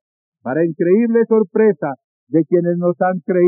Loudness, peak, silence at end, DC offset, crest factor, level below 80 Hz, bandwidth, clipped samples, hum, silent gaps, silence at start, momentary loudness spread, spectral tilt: -16 LUFS; -4 dBFS; 0 s; under 0.1%; 12 dB; -88 dBFS; 2.6 kHz; under 0.1%; none; 2.04-2.27 s; 0.45 s; 10 LU; -12 dB/octave